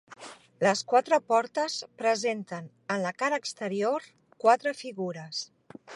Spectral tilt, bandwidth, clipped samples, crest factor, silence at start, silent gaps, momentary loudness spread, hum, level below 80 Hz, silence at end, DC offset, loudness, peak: -3.5 dB/octave; 11.5 kHz; under 0.1%; 20 dB; 0.1 s; none; 15 LU; none; -82 dBFS; 0 s; under 0.1%; -28 LUFS; -8 dBFS